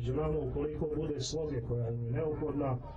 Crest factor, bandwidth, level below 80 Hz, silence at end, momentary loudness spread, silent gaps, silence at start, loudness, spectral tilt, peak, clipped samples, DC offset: 10 dB; 9.2 kHz; -46 dBFS; 0 s; 2 LU; none; 0 s; -35 LUFS; -7 dB/octave; -24 dBFS; under 0.1%; under 0.1%